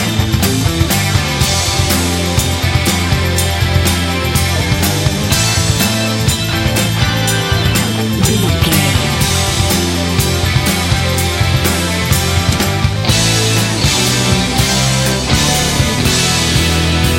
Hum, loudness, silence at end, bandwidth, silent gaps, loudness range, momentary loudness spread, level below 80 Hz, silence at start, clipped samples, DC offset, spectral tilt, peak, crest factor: none; -13 LUFS; 0 s; 16.5 kHz; none; 1 LU; 3 LU; -24 dBFS; 0 s; under 0.1%; under 0.1%; -4 dB/octave; 0 dBFS; 12 dB